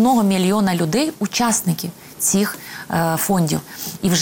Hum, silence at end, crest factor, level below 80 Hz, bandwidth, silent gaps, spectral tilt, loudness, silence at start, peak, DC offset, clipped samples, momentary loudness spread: none; 0 s; 12 dB; -54 dBFS; 17 kHz; none; -4.5 dB/octave; -19 LUFS; 0 s; -6 dBFS; under 0.1%; under 0.1%; 8 LU